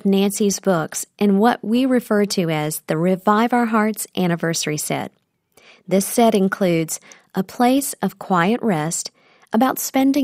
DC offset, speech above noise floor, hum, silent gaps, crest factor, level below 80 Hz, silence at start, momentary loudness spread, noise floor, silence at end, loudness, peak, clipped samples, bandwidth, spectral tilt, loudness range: under 0.1%; 38 dB; none; none; 16 dB; -64 dBFS; 0.05 s; 9 LU; -56 dBFS; 0 s; -19 LUFS; -2 dBFS; under 0.1%; 16 kHz; -5 dB/octave; 2 LU